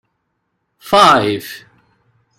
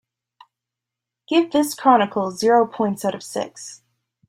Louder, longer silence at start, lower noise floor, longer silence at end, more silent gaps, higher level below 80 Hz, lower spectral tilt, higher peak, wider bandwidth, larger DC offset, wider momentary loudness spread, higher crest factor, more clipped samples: first, -12 LUFS vs -20 LUFS; second, 0.85 s vs 1.3 s; second, -70 dBFS vs -86 dBFS; first, 0.8 s vs 0.55 s; neither; first, -52 dBFS vs -68 dBFS; about the same, -4 dB/octave vs -4.5 dB/octave; about the same, 0 dBFS vs -2 dBFS; about the same, 16.5 kHz vs 16 kHz; neither; first, 23 LU vs 13 LU; about the same, 16 dB vs 18 dB; neither